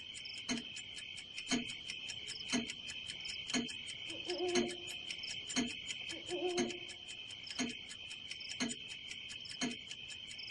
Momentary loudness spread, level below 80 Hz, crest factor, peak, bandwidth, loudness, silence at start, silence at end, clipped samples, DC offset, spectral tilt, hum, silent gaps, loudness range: 8 LU; -70 dBFS; 22 dB; -20 dBFS; 12 kHz; -41 LUFS; 0 s; 0 s; under 0.1%; under 0.1%; -2 dB/octave; none; none; 3 LU